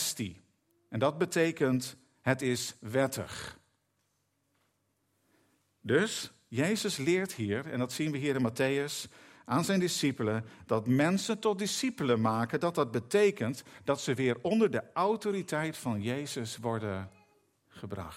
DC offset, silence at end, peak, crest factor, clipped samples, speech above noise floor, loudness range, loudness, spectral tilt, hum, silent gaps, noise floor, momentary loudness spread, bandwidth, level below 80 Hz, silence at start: under 0.1%; 0 s; -12 dBFS; 20 dB; under 0.1%; 46 dB; 6 LU; -31 LUFS; -5 dB/octave; none; none; -77 dBFS; 10 LU; 16 kHz; -72 dBFS; 0 s